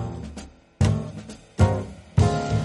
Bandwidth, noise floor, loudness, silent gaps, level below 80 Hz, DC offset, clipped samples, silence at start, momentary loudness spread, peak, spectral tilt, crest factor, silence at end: 11.5 kHz; -42 dBFS; -24 LUFS; none; -36 dBFS; under 0.1%; under 0.1%; 0 s; 17 LU; -6 dBFS; -7 dB/octave; 18 dB; 0 s